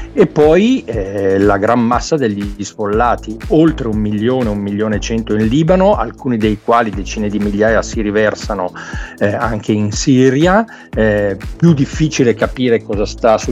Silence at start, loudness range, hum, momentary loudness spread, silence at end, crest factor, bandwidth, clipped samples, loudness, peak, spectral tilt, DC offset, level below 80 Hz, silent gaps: 0 s; 2 LU; none; 9 LU; 0 s; 14 dB; 11 kHz; under 0.1%; -14 LUFS; 0 dBFS; -6 dB/octave; under 0.1%; -30 dBFS; none